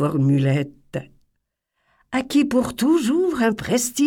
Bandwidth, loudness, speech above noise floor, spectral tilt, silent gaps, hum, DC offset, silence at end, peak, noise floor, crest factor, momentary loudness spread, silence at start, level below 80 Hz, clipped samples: 17.5 kHz; -20 LUFS; 56 dB; -5.5 dB/octave; none; none; under 0.1%; 0 s; -6 dBFS; -75 dBFS; 16 dB; 12 LU; 0 s; -54 dBFS; under 0.1%